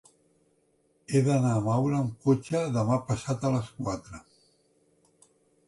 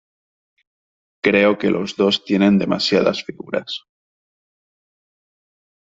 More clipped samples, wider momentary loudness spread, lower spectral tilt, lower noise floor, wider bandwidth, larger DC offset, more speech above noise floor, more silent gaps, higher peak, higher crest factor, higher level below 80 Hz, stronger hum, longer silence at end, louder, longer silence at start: neither; about the same, 10 LU vs 12 LU; first, -7.5 dB/octave vs -5.5 dB/octave; second, -69 dBFS vs under -90 dBFS; first, 11.5 kHz vs 7.8 kHz; neither; second, 42 dB vs over 72 dB; neither; second, -12 dBFS vs -2 dBFS; about the same, 18 dB vs 18 dB; about the same, -58 dBFS vs -60 dBFS; neither; second, 1.5 s vs 2.05 s; second, -28 LUFS vs -18 LUFS; second, 1.1 s vs 1.25 s